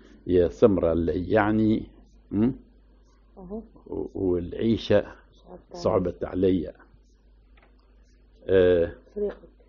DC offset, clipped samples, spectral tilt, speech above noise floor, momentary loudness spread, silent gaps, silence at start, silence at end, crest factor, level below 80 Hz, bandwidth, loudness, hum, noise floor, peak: under 0.1%; under 0.1%; -6.5 dB/octave; 32 dB; 19 LU; none; 0.25 s; 0.35 s; 20 dB; -46 dBFS; 7 kHz; -25 LUFS; none; -56 dBFS; -6 dBFS